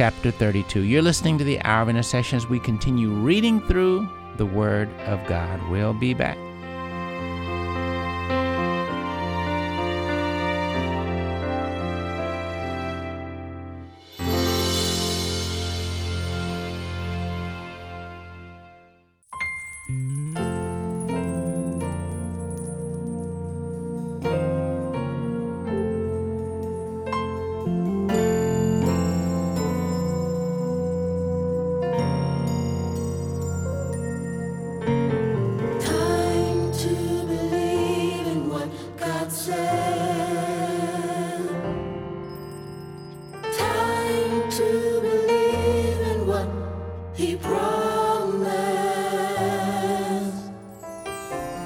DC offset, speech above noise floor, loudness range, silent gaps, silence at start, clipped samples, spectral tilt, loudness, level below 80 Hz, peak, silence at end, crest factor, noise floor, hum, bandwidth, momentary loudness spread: under 0.1%; 35 dB; 7 LU; none; 0 s; under 0.1%; -6 dB/octave; -25 LUFS; -42 dBFS; -4 dBFS; 0 s; 20 dB; -57 dBFS; none; 17 kHz; 10 LU